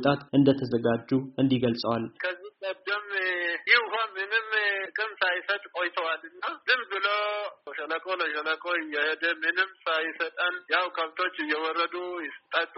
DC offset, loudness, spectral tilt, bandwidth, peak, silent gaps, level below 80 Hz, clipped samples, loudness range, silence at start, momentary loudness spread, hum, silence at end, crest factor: under 0.1%; -27 LUFS; -2.5 dB/octave; 5.8 kHz; -6 dBFS; none; -70 dBFS; under 0.1%; 2 LU; 0 s; 10 LU; none; 0 s; 22 dB